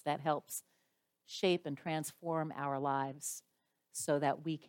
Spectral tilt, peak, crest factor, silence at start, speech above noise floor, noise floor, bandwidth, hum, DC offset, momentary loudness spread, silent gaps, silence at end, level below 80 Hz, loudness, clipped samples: -4.5 dB/octave; -20 dBFS; 18 dB; 0.05 s; 44 dB; -81 dBFS; 17 kHz; none; under 0.1%; 11 LU; none; 0 s; -86 dBFS; -37 LUFS; under 0.1%